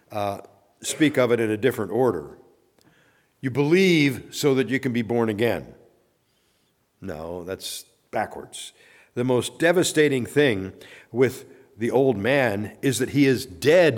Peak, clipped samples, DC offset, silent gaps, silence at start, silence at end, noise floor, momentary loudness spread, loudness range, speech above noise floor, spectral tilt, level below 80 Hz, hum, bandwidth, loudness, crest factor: -6 dBFS; under 0.1%; under 0.1%; none; 0.1 s; 0 s; -67 dBFS; 16 LU; 8 LU; 45 dB; -5 dB/octave; -62 dBFS; none; 18.5 kHz; -23 LUFS; 16 dB